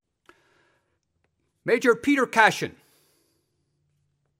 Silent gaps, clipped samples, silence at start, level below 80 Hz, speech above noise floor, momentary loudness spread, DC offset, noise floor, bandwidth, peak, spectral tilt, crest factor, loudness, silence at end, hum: none; under 0.1%; 1.65 s; -68 dBFS; 52 dB; 15 LU; under 0.1%; -74 dBFS; 16 kHz; -2 dBFS; -4 dB/octave; 24 dB; -21 LUFS; 1.7 s; none